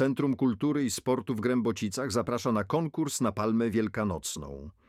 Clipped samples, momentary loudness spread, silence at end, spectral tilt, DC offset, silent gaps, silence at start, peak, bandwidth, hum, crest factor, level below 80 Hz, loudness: under 0.1%; 5 LU; 0.2 s; -5.5 dB/octave; under 0.1%; none; 0 s; -14 dBFS; 16 kHz; none; 14 dB; -56 dBFS; -29 LUFS